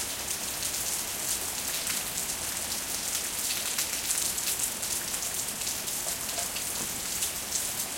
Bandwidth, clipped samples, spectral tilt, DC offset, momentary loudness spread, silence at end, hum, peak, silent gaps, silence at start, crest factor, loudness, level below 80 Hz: 17 kHz; under 0.1%; 0 dB/octave; under 0.1%; 3 LU; 0 s; none; -10 dBFS; none; 0 s; 22 dB; -29 LUFS; -56 dBFS